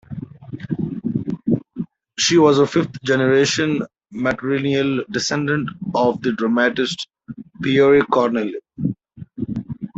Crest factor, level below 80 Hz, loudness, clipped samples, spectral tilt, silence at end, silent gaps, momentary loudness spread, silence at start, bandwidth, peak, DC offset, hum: 16 dB; -54 dBFS; -19 LUFS; under 0.1%; -5 dB/octave; 0.1 s; none; 18 LU; 0.1 s; 8 kHz; -2 dBFS; under 0.1%; none